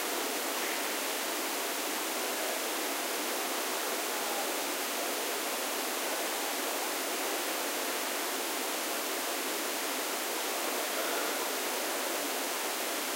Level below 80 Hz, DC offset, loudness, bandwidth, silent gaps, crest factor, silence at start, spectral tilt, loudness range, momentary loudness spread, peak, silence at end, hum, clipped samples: under -90 dBFS; under 0.1%; -32 LUFS; 16 kHz; none; 14 dB; 0 s; 0.5 dB/octave; 0 LU; 1 LU; -18 dBFS; 0 s; none; under 0.1%